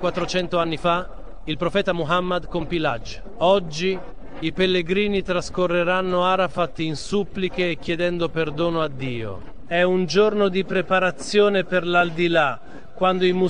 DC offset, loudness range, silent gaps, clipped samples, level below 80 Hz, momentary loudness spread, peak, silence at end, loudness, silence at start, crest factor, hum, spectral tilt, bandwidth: 2%; 4 LU; none; under 0.1%; -42 dBFS; 10 LU; -4 dBFS; 0 s; -22 LUFS; 0 s; 18 dB; none; -5.5 dB/octave; 10 kHz